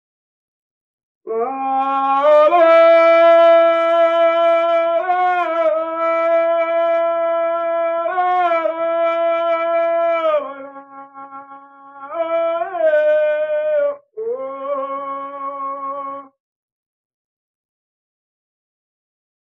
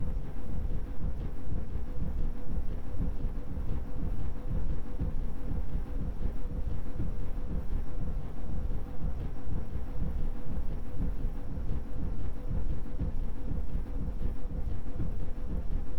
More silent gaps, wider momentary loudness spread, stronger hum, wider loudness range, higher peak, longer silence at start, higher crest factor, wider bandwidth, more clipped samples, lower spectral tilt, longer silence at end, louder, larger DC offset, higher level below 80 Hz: neither; first, 16 LU vs 3 LU; neither; first, 15 LU vs 1 LU; first, -2 dBFS vs -18 dBFS; first, 1.25 s vs 0 s; about the same, 14 dB vs 10 dB; first, 5.6 kHz vs 3.4 kHz; neither; second, -4 dB/octave vs -9 dB/octave; first, 3.25 s vs 0 s; first, -16 LUFS vs -39 LUFS; second, under 0.1% vs 2%; second, -76 dBFS vs -32 dBFS